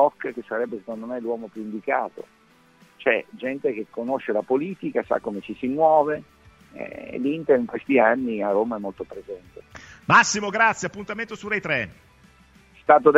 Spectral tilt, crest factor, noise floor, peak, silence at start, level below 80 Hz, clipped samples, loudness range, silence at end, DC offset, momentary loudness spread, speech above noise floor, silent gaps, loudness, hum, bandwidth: -4.5 dB/octave; 22 dB; -56 dBFS; -2 dBFS; 0 s; -62 dBFS; under 0.1%; 6 LU; 0 s; under 0.1%; 17 LU; 33 dB; none; -23 LUFS; none; 8.2 kHz